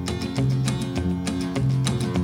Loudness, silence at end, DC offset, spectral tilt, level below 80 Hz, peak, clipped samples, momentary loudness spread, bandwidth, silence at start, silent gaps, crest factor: -24 LUFS; 0 s; under 0.1%; -6 dB/octave; -42 dBFS; -10 dBFS; under 0.1%; 3 LU; 13.5 kHz; 0 s; none; 12 dB